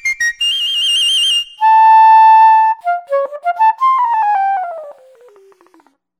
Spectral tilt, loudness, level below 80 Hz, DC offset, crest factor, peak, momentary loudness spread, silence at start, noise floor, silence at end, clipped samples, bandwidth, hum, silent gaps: 3.5 dB/octave; -11 LUFS; -64 dBFS; under 0.1%; 12 dB; -2 dBFS; 13 LU; 0.05 s; -52 dBFS; 1.25 s; under 0.1%; 15 kHz; none; none